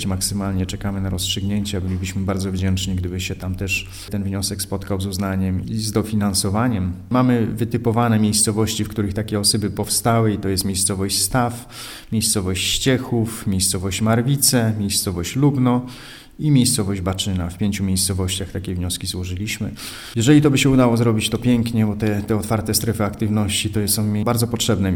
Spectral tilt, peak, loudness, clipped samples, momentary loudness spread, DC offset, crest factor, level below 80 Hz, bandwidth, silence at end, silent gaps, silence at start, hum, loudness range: -4.5 dB/octave; 0 dBFS; -20 LUFS; under 0.1%; 9 LU; under 0.1%; 20 dB; -40 dBFS; 19 kHz; 0 s; none; 0 s; none; 5 LU